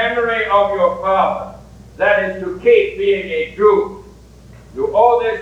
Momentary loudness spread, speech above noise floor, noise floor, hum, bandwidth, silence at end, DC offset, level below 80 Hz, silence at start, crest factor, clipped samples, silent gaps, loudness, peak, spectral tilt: 10 LU; 26 dB; -41 dBFS; none; 8.4 kHz; 0 s; under 0.1%; -44 dBFS; 0 s; 16 dB; under 0.1%; none; -15 LUFS; 0 dBFS; -6 dB/octave